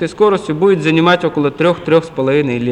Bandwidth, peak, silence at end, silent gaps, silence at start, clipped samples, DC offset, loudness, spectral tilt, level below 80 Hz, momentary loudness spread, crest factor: 10 kHz; 0 dBFS; 0 s; none; 0 s; under 0.1%; under 0.1%; -13 LUFS; -7 dB/octave; -48 dBFS; 4 LU; 12 dB